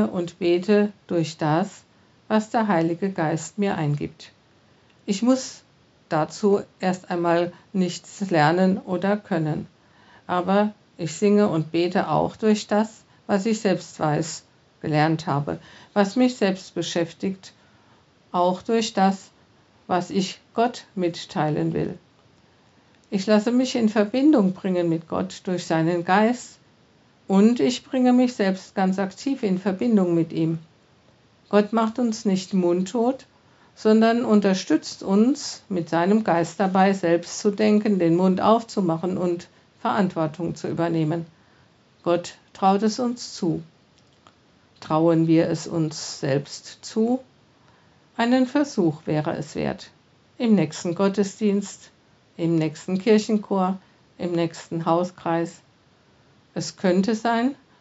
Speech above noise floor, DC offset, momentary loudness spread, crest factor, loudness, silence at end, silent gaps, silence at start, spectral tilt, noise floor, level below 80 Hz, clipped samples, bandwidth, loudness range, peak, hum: 36 dB; under 0.1%; 10 LU; 18 dB; -23 LUFS; 0.25 s; none; 0 s; -6 dB/octave; -58 dBFS; -64 dBFS; under 0.1%; 8 kHz; 5 LU; -4 dBFS; none